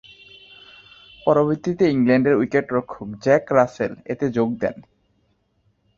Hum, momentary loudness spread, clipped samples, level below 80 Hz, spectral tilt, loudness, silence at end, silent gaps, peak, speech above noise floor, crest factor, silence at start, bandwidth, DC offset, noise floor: none; 10 LU; under 0.1%; -56 dBFS; -7.5 dB/octave; -20 LUFS; 1.15 s; none; -2 dBFS; 46 dB; 20 dB; 1.25 s; 7.2 kHz; under 0.1%; -66 dBFS